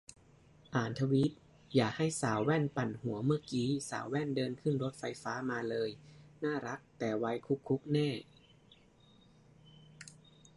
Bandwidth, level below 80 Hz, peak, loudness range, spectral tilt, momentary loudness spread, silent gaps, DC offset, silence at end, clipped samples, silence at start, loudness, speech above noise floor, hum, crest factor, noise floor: 11.5 kHz; -68 dBFS; -16 dBFS; 5 LU; -6 dB/octave; 9 LU; none; under 0.1%; 0.45 s; under 0.1%; 0.1 s; -35 LUFS; 29 dB; none; 20 dB; -64 dBFS